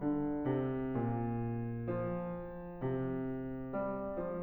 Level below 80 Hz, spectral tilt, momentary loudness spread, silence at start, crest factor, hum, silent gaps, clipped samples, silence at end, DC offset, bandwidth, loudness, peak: -56 dBFS; -12 dB/octave; 6 LU; 0 s; 14 dB; none; none; under 0.1%; 0 s; under 0.1%; 3.8 kHz; -38 LUFS; -22 dBFS